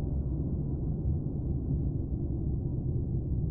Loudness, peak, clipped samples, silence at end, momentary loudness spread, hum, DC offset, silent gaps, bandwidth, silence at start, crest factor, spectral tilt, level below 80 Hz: -33 LUFS; -20 dBFS; under 0.1%; 0 s; 1 LU; none; under 0.1%; none; 1.4 kHz; 0 s; 12 dB; -16.5 dB/octave; -36 dBFS